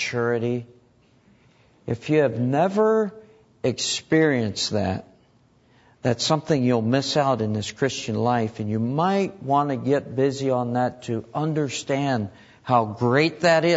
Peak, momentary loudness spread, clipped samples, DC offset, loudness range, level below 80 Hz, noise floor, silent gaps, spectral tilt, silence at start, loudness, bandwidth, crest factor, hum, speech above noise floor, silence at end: -6 dBFS; 8 LU; under 0.1%; under 0.1%; 2 LU; -62 dBFS; -59 dBFS; none; -5.5 dB/octave; 0 s; -23 LUFS; 8 kHz; 18 dB; none; 37 dB; 0 s